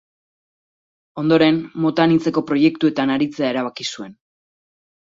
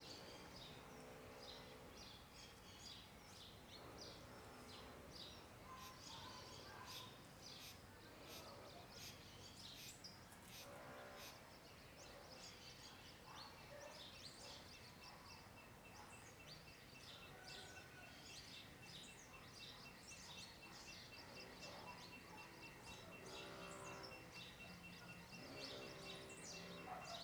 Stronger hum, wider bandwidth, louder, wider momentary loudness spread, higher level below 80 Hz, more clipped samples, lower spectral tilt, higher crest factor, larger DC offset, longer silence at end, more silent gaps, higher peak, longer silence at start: neither; second, 7.6 kHz vs over 20 kHz; first, -18 LUFS vs -57 LUFS; first, 12 LU vs 5 LU; first, -62 dBFS vs -74 dBFS; neither; first, -6 dB/octave vs -3 dB/octave; about the same, 18 dB vs 18 dB; neither; first, 0.9 s vs 0 s; neither; first, -2 dBFS vs -40 dBFS; first, 1.15 s vs 0 s